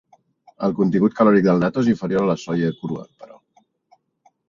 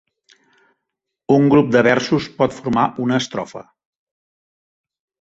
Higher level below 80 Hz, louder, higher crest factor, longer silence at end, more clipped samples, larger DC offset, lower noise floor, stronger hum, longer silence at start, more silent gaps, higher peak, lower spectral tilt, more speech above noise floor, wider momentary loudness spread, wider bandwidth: about the same, -58 dBFS vs -54 dBFS; about the same, -19 LUFS vs -17 LUFS; about the same, 18 dB vs 18 dB; second, 1.25 s vs 1.6 s; neither; neither; second, -62 dBFS vs -80 dBFS; neither; second, 0.6 s vs 1.3 s; neither; about the same, -2 dBFS vs -2 dBFS; first, -8 dB/octave vs -6 dB/octave; second, 43 dB vs 64 dB; second, 12 LU vs 17 LU; about the same, 7.4 kHz vs 8 kHz